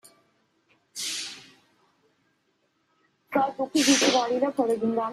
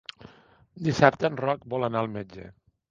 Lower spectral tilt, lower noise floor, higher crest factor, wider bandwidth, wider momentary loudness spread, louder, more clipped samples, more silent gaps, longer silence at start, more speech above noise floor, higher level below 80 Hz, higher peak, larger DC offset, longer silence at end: second, -2 dB/octave vs -6.5 dB/octave; first, -71 dBFS vs -57 dBFS; second, 20 dB vs 26 dB; first, 14 kHz vs 7.6 kHz; second, 16 LU vs 21 LU; about the same, -24 LUFS vs -26 LUFS; neither; neither; first, 0.95 s vs 0.75 s; first, 48 dB vs 31 dB; second, -72 dBFS vs -58 dBFS; second, -8 dBFS vs 0 dBFS; neither; second, 0 s vs 0.4 s